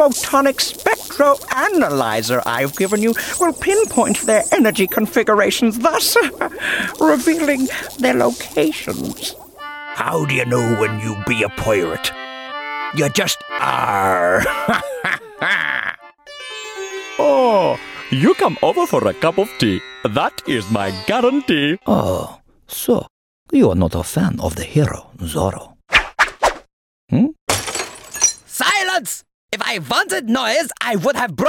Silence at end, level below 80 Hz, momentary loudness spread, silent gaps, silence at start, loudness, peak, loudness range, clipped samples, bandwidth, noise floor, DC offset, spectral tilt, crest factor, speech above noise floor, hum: 0 s; -44 dBFS; 11 LU; 23.10-23.46 s, 26.73-27.08 s, 27.41-27.47 s, 29.34-29.48 s; 0 s; -17 LUFS; 0 dBFS; 4 LU; under 0.1%; 17.5 kHz; -38 dBFS; under 0.1%; -4 dB/octave; 18 dB; 21 dB; none